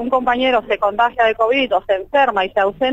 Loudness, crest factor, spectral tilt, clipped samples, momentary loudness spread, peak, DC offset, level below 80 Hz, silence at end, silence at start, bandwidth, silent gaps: -16 LUFS; 14 dB; -5 dB/octave; under 0.1%; 3 LU; -2 dBFS; under 0.1%; -46 dBFS; 0 s; 0 s; 7.8 kHz; none